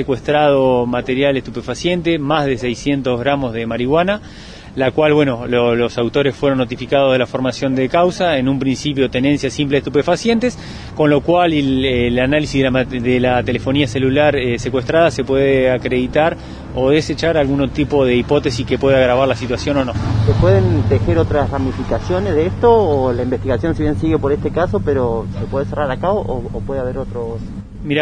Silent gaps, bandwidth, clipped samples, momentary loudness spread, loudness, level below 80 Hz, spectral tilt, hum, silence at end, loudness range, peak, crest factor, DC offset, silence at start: none; 10 kHz; under 0.1%; 8 LU; -16 LUFS; -32 dBFS; -6.5 dB/octave; none; 0 s; 3 LU; 0 dBFS; 16 dB; under 0.1%; 0 s